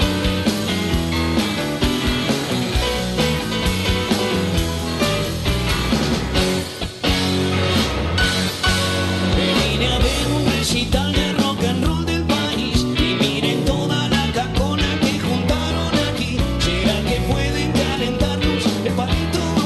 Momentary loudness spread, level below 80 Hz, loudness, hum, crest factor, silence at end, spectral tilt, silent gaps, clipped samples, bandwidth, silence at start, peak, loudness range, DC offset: 3 LU; -28 dBFS; -19 LUFS; none; 14 dB; 0 s; -4.5 dB/octave; none; under 0.1%; 12.5 kHz; 0 s; -4 dBFS; 2 LU; under 0.1%